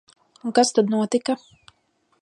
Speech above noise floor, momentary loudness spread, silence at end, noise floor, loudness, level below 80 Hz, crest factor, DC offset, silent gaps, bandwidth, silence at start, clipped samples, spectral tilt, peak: 46 dB; 11 LU; 0.85 s; -67 dBFS; -21 LUFS; -74 dBFS; 20 dB; under 0.1%; none; 11 kHz; 0.45 s; under 0.1%; -4 dB/octave; -4 dBFS